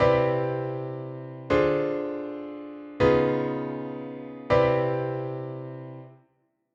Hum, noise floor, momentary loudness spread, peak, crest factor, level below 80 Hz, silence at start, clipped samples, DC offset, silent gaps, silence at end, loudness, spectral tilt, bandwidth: none; -71 dBFS; 17 LU; -8 dBFS; 18 dB; -50 dBFS; 0 s; under 0.1%; under 0.1%; none; 0.6 s; -26 LUFS; -8.5 dB/octave; 7.4 kHz